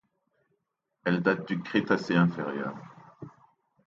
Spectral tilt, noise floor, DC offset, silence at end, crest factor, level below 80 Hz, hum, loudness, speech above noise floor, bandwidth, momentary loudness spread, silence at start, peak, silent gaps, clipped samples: -7.5 dB/octave; -80 dBFS; under 0.1%; 0.6 s; 22 dB; -70 dBFS; none; -28 LUFS; 52 dB; 7.2 kHz; 23 LU; 1.05 s; -10 dBFS; none; under 0.1%